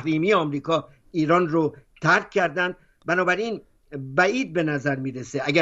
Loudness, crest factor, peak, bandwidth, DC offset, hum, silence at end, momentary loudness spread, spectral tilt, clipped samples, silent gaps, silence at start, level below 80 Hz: -23 LUFS; 18 dB; -4 dBFS; 8 kHz; under 0.1%; none; 0 s; 10 LU; -5.5 dB/octave; under 0.1%; none; 0 s; -60 dBFS